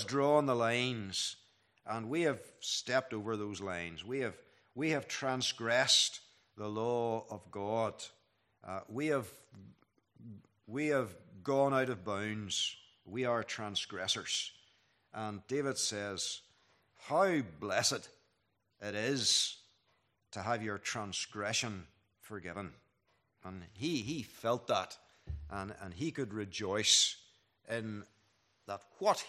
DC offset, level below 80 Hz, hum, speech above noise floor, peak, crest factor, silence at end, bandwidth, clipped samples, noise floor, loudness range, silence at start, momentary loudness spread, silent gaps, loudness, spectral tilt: under 0.1%; -66 dBFS; none; 44 dB; -12 dBFS; 24 dB; 0 s; 14.5 kHz; under 0.1%; -79 dBFS; 7 LU; 0 s; 19 LU; none; -35 LUFS; -3 dB/octave